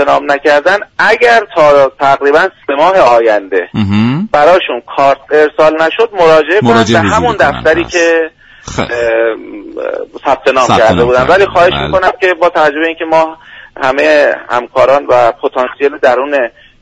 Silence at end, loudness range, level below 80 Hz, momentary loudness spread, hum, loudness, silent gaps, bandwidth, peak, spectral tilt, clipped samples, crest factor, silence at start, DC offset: 0.35 s; 3 LU; -38 dBFS; 8 LU; none; -9 LUFS; none; 10.5 kHz; 0 dBFS; -5 dB/octave; 0.3%; 10 dB; 0 s; under 0.1%